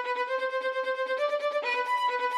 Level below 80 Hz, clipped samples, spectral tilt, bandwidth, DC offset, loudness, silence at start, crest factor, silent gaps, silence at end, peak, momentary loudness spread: under -90 dBFS; under 0.1%; 1 dB/octave; 13 kHz; under 0.1%; -29 LUFS; 0 s; 12 dB; none; 0 s; -16 dBFS; 3 LU